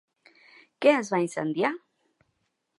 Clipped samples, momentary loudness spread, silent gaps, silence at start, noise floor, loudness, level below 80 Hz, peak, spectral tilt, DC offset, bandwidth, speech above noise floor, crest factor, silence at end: under 0.1%; 7 LU; none; 0.8 s; -76 dBFS; -26 LUFS; -80 dBFS; -8 dBFS; -5 dB/octave; under 0.1%; 11.5 kHz; 52 dB; 22 dB; 1 s